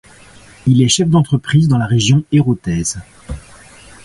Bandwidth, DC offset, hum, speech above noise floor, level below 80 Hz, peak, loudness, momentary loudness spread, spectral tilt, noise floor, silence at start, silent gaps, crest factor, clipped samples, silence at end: 11.5 kHz; under 0.1%; none; 29 dB; -38 dBFS; 0 dBFS; -14 LUFS; 20 LU; -5.5 dB/octave; -41 dBFS; 0.65 s; none; 14 dB; under 0.1%; 0.65 s